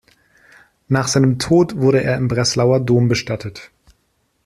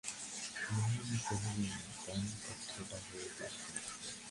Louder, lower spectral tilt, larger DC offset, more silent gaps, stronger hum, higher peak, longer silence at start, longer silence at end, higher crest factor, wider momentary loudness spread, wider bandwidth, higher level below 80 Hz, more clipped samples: first, -16 LUFS vs -41 LUFS; first, -5.5 dB/octave vs -4 dB/octave; neither; neither; neither; first, -2 dBFS vs -24 dBFS; first, 0.9 s vs 0.05 s; first, 0.8 s vs 0 s; about the same, 14 dB vs 18 dB; first, 11 LU vs 8 LU; first, 13 kHz vs 11.5 kHz; first, -48 dBFS vs -64 dBFS; neither